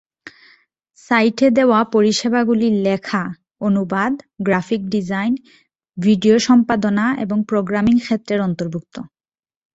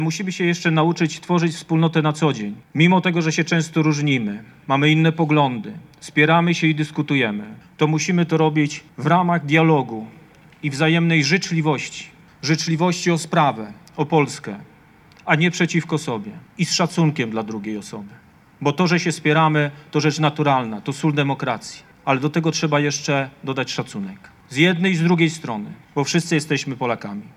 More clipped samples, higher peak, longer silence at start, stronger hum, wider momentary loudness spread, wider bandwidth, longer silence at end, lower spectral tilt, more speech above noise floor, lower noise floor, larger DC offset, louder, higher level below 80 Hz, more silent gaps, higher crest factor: neither; about the same, -2 dBFS vs -2 dBFS; first, 0.25 s vs 0 s; neither; second, 10 LU vs 13 LU; second, 8 kHz vs 12 kHz; first, 0.7 s vs 0.1 s; about the same, -6 dB/octave vs -5.5 dB/octave; first, over 73 dB vs 30 dB; first, under -90 dBFS vs -50 dBFS; neither; first, -17 LUFS vs -20 LUFS; first, -54 dBFS vs -64 dBFS; neither; about the same, 16 dB vs 18 dB